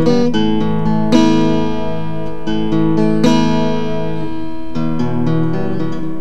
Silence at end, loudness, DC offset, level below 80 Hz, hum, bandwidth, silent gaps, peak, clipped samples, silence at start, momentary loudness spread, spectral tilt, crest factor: 0 s; -16 LUFS; 10%; -36 dBFS; none; 9 kHz; none; 0 dBFS; under 0.1%; 0 s; 10 LU; -7 dB/octave; 16 dB